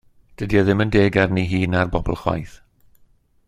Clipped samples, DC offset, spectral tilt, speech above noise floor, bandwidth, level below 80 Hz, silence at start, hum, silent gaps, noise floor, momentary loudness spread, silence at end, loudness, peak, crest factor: under 0.1%; under 0.1%; -7.5 dB/octave; 37 dB; 11.5 kHz; -36 dBFS; 0.4 s; none; none; -56 dBFS; 11 LU; 1 s; -19 LUFS; -2 dBFS; 18 dB